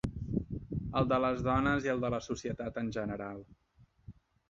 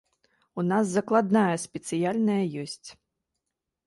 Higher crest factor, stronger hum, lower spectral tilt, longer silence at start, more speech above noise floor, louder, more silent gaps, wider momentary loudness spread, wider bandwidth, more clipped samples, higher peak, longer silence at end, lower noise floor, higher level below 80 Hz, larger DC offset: about the same, 18 dB vs 18 dB; neither; about the same, -6 dB/octave vs -6 dB/octave; second, 0.05 s vs 0.55 s; second, 25 dB vs 59 dB; second, -34 LUFS vs -26 LUFS; neither; second, 10 LU vs 14 LU; second, 7.6 kHz vs 11.5 kHz; neither; second, -16 dBFS vs -8 dBFS; second, 0.4 s vs 0.95 s; second, -58 dBFS vs -84 dBFS; first, -50 dBFS vs -70 dBFS; neither